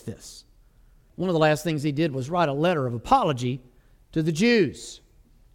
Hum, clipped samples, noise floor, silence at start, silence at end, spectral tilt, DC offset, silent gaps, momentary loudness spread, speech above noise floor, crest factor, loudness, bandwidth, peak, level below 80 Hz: none; under 0.1%; -56 dBFS; 0.05 s; 0.55 s; -6 dB/octave; under 0.1%; none; 18 LU; 32 dB; 20 dB; -24 LUFS; 17.5 kHz; -6 dBFS; -52 dBFS